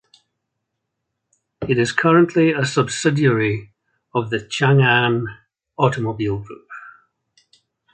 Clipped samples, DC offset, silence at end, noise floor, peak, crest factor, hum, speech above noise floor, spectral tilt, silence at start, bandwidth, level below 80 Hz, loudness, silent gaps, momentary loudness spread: under 0.1%; under 0.1%; 1.05 s; -78 dBFS; -2 dBFS; 18 dB; none; 60 dB; -6 dB/octave; 1.6 s; 9.2 kHz; -54 dBFS; -18 LUFS; none; 17 LU